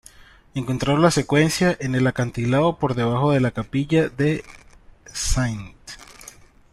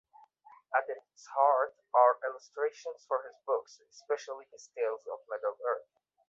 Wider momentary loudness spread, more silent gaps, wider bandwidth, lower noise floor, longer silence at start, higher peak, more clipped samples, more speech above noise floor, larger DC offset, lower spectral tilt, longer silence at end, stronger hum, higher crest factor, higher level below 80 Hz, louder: about the same, 18 LU vs 16 LU; neither; first, 13.5 kHz vs 7.8 kHz; second, -48 dBFS vs -60 dBFS; second, 0.55 s vs 0.7 s; first, -2 dBFS vs -10 dBFS; neither; about the same, 28 dB vs 28 dB; neither; first, -5.5 dB/octave vs -1 dB/octave; first, 0.7 s vs 0.5 s; neither; about the same, 18 dB vs 22 dB; first, -38 dBFS vs under -90 dBFS; first, -21 LUFS vs -32 LUFS